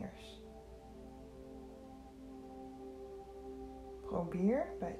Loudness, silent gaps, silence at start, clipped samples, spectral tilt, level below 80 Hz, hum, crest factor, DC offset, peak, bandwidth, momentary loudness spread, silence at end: -42 LUFS; none; 0 s; under 0.1%; -8 dB/octave; -60 dBFS; none; 20 dB; under 0.1%; -24 dBFS; 13 kHz; 19 LU; 0 s